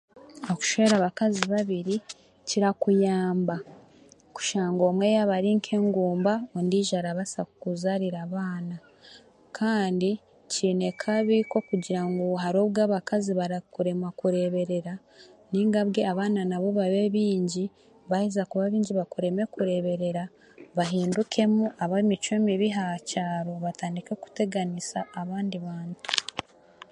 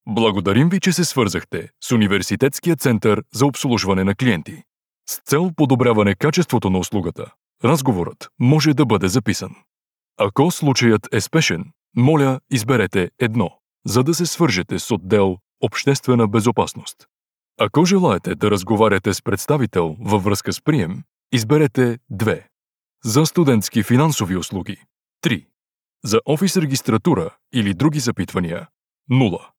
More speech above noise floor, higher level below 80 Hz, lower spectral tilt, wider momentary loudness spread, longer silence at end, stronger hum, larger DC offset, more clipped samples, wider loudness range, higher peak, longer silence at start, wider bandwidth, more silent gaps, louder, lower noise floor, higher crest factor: second, 30 dB vs 72 dB; second, -70 dBFS vs -54 dBFS; about the same, -5.5 dB/octave vs -5.5 dB/octave; about the same, 10 LU vs 10 LU; first, 0.5 s vs 0.2 s; neither; neither; neither; first, 5 LU vs 2 LU; about the same, 0 dBFS vs -2 dBFS; about the same, 0.15 s vs 0.05 s; second, 11 kHz vs 19.5 kHz; second, none vs 25.74-25.78 s, 28.84-28.88 s; second, -27 LUFS vs -18 LUFS; second, -55 dBFS vs -90 dBFS; first, 26 dB vs 16 dB